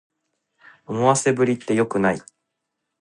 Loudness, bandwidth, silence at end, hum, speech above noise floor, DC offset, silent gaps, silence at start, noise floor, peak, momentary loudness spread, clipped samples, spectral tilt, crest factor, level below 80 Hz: -21 LUFS; 11.5 kHz; 0.8 s; none; 59 dB; under 0.1%; none; 0.9 s; -79 dBFS; -2 dBFS; 9 LU; under 0.1%; -5 dB/octave; 22 dB; -60 dBFS